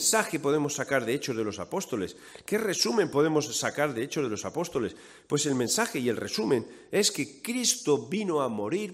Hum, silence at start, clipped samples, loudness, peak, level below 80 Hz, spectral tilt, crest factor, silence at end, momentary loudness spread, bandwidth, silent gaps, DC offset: none; 0 s; under 0.1%; -28 LUFS; -8 dBFS; -68 dBFS; -3 dB/octave; 20 dB; 0 s; 7 LU; 16 kHz; none; under 0.1%